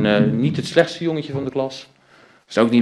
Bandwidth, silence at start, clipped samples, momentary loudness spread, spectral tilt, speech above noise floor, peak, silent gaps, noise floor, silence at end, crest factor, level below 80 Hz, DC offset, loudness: 11.5 kHz; 0 s; under 0.1%; 9 LU; -6.5 dB/octave; 33 dB; 0 dBFS; none; -52 dBFS; 0 s; 20 dB; -56 dBFS; under 0.1%; -20 LUFS